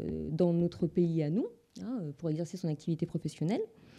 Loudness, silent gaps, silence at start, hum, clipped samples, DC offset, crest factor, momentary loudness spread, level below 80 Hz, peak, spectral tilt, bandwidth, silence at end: -33 LUFS; none; 0 s; none; under 0.1%; under 0.1%; 16 dB; 9 LU; -60 dBFS; -18 dBFS; -8.5 dB/octave; 10.5 kHz; 0 s